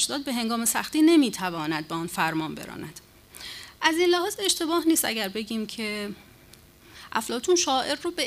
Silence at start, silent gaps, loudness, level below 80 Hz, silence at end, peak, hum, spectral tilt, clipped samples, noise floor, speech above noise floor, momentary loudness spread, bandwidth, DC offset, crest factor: 0 s; none; -25 LUFS; -60 dBFS; 0 s; -8 dBFS; none; -2.5 dB/octave; under 0.1%; -52 dBFS; 27 dB; 17 LU; 15.5 kHz; under 0.1%; 20 dB